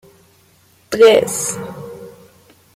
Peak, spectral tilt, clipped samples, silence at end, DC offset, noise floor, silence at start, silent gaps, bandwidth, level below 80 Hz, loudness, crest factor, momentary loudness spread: -2 dBFS; -3 dB/octave; under 0.1%; 0.65 s; under 0.1%; -53 dBFS; 0.9 s; none; 16 kHz; -58 dBFS; -14 LUFS; 16 dB; 23 LU